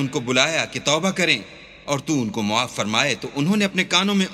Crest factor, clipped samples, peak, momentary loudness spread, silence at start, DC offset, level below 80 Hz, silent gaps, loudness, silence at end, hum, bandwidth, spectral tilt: 22 dB; under 0.1%; 0 dBFS; 6 LU; 0 s; under 0.1%; -58 dBFS; none; -20 LUFS; 0 s; none; 14 kHz; -3.5 dB/octave